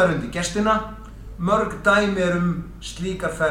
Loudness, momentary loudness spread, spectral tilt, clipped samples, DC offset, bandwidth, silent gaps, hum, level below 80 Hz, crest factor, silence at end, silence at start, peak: -22 LUFS; 15 LU; -5.5 dB/octave; under 0.1%; under 0.1%; 13.5 kHz; none; none; -40 dBFS; 18 dB; 0 s; 0 s; -4 dBFS